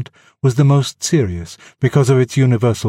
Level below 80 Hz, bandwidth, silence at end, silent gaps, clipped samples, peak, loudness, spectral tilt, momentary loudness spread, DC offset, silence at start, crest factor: -46 dBFS; 13 kHz; 0 s; none; under 0.1%; 0 dBFS; -15 LUFS; -6.5 dB/octave; 13 LU; under 0.1%; 0 s; 14 dB